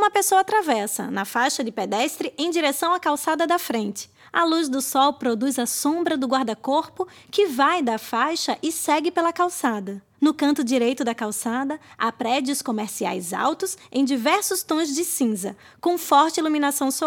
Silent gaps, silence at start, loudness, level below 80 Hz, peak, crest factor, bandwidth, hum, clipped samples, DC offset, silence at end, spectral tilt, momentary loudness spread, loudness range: none; 0 s; -22 LUFS; -72 dBFS; -4 dBFS; 18 dB; 19 kHz; none; under 0.1%; under 0.1%; 0 s; -2.5 dB/octave; 7 LU; 2 LU